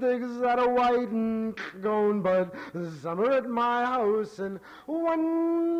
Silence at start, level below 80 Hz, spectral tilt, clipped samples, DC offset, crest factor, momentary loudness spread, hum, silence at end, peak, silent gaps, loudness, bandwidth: 0 s; -64 dBFS; -7 dB/octave; under 0.1%; under 0.1%; 10 dB; 11 LU; none; 0 s; -16 dBFS; none; -27 LUFS; 9.4 kHz